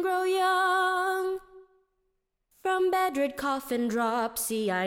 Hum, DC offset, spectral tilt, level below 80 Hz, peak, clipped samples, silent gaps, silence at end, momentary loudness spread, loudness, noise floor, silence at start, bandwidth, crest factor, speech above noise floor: none; under 0.1%; -3 dB/octave; -64 dBFS; -16 dBFS; under 0.1%; none; 0 s; 7 LU; -27 LUFS; -78 dBFS; 0 s; 17.5 kHz; 12 dB; 50 dB